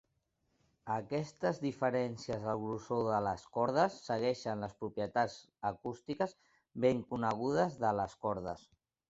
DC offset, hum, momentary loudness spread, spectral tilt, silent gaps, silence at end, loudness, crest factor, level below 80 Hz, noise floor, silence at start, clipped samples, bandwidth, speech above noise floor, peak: under 0.1%; none; 8 LU; -5.5 dB/octave; none; 0.5 s; -36 LUFS; 20 dB; -66 dBFS; -80 dBFS; 0.85 s; under 0.1%; 8 kHz; 45 dB; -16 dBFS